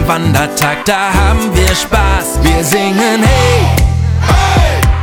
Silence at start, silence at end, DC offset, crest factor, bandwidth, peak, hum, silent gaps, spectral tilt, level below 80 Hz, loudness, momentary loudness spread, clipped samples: 0 s; 0 s; 0.1%; 10 dB; 19.5 kHz; 0 dBFS; none; none; -4.5 dB/octave; -16 dBFS; -11 LUFS; 3 LU; under 0.1%